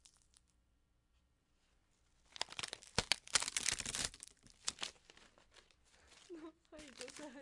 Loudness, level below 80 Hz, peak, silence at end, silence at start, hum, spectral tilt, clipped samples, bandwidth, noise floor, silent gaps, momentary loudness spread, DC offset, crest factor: -40 LUFS; -66 dBFS; -10 dBFS; 0 s; 0.05 s; 60 Hz at -80 dBFS; -0.5 dB/octave; under 0.1%; 12 kHz; -77 dBFS; none; 21 LU; under 0.1%; 38 dB